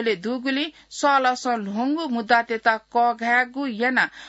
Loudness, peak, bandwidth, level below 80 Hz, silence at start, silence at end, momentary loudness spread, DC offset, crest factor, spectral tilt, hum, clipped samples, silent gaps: -22 LUFS; -6 dBFS; 8 kHz; -68 dBFS; 0 s; 0 s; 6 LU; under 0.1%; 16 dB; -3.5 dB/octave; none; under 0.1%; none